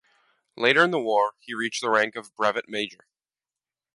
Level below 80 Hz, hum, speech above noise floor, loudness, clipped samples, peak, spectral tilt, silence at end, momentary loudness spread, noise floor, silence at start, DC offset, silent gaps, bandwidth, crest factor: -76 dBFS; none; over 66 dB; -24 LUFS; under 0.1%; -4 dBFS; -3.5 dB/octave; 1 s; 11 LU; under -90 dBFS; 0.55 s; under 0.1%; none; 11.5 kHz; 22 dB